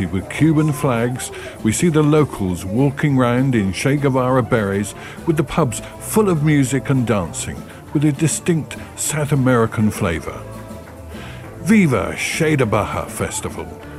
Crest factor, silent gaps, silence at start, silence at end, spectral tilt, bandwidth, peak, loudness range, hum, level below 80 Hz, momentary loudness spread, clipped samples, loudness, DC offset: 16 dB; none; 0 s; 0 s; -6 dB/octave; 15.5 kHz; -2 dBFS; 2 LU; none; -42 dBFS; 14 LU; under 0.1%; -18 LUFS; under 0.1%